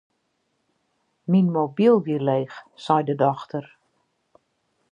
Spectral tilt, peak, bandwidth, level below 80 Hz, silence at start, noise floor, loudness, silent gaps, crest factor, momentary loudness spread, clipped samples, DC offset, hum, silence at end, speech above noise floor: -9 dB/octave; -4 dBFS; 7.6 kHz; -76 dBFS; 1.3 s; -73 dBFS; -21 LUFS; none; 20 dB; 16 LU; under 0.1%; under 0.1%; none; 1.3 s; 51 dB